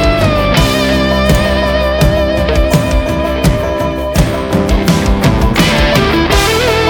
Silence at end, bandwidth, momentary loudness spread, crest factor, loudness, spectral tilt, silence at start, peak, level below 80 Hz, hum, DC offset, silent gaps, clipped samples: 0 s; 19.5 kHz; 4 LU; 10 dB; -11 LUFS; -5.5 dB/octave; 0 s; 0 dBFS; -18 dBFS; none; under 0.1%; none; under 0.1%